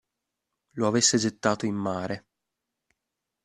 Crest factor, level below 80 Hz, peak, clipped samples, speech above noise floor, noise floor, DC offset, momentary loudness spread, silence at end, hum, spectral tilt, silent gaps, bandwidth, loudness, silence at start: 22 dB; -66 dBFS; -6 dBFS; under 0.1%; 59 dB; -85 dBFS; under 0.1%; 15 LU; 1.25 s; none; -3.5 dB/octave; none; 12.5 kHz; -25 LUFS; 0.75 s